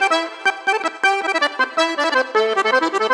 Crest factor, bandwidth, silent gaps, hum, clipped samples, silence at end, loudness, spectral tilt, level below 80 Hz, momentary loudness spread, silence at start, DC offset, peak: 14 dB; 12.5 kHz; none; none; under 0.1%; 0 s; -18 LUFS; -1 dB/octave; -78 dBFS; 3 LU; 0 s; under 0.1%; -4 dBFS